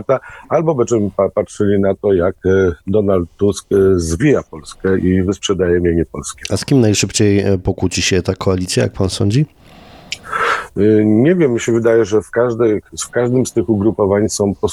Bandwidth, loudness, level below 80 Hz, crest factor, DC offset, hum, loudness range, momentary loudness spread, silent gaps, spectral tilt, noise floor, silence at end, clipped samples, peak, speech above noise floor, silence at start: 13.5 kHz; -15 LUFS; -38 dBFS; 14 dB; under 0.1%; none; 2 LU; 6 LU; none; -5.5 dB/octave; -40 dBFS; 0 s; under 0.1%; -2 dBFS; 26 dB; 0 s